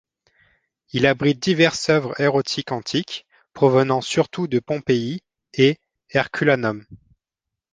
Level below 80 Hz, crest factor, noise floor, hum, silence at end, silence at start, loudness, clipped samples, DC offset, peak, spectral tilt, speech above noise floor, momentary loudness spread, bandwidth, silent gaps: -58 dBFS; 20 dB; -85 dBFS; none; 0.75 s; 0.95 s; -20 LUFS; under 0.1%; under 0.1%; -2 dBFS; -5.5 dB/octave; 66 dB; 12 LU; 9.8 kHz; none